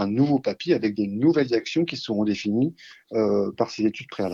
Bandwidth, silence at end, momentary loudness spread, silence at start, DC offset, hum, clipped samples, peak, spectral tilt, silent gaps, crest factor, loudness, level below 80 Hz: 7.4 kHz; 0 s; 5 LU; 0 s; under 0.1%; none; under 0.1%; -8 dBFS; -7 dB/octave; none; 16 dB; -24 LUFS; -66 dBFS